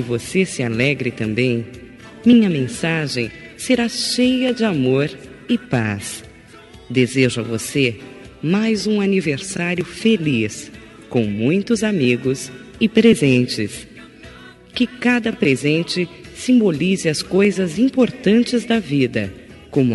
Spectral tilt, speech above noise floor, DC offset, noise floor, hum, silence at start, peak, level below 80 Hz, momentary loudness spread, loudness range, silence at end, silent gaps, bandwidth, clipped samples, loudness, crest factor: -5.5 dB/octave; 25 dB; under 0.1%; -42 dBFS; none; 0 s; -2 dBFS; -52 dBFS; 12 LU; 3 LU; 0 s; none; 11.5 kHz; under 0.1%; -18 LUFS; 16 dB